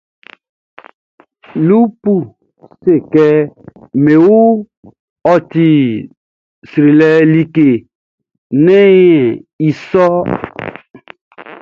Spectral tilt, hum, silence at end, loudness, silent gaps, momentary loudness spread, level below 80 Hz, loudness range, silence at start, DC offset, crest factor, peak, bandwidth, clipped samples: -9 dB/octave; none; 0.1 s; -11 LUFS; 4.77-4.83 s, 4.99-5.16 s, 6.17-6.62 s, 7.95-8.18 s, 8.38-8.50 s, 9.53-9.59 s, 11.21-11.31 s; 13 LU; -52 dBFS; 4 LU; 1.55 s; under 0.1%; 12 dB; 0 dBFS; 6.8 kHz; under 0.1%